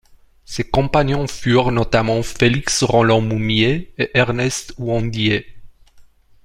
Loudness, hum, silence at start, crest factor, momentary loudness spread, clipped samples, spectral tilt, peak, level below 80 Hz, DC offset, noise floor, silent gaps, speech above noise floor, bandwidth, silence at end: -17 LUFS; none; 0.5 s; 16 dB; 7 LU; under 0.1%; -5 dB/octave; -2 dBFS; -36 dBFS; under 0.1%; -47 dBFS; none; 30 dB; 15 kHz; 0.45 s